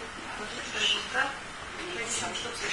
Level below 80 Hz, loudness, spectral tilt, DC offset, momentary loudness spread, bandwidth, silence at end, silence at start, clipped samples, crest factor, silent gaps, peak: -56 dBFS; -31 LUFS; -1 dB/octave; under 0.1%; 12 LU; 11 kHz; 0 s; 0 s; under 0.1%; 20 dB; none; -14 dBFS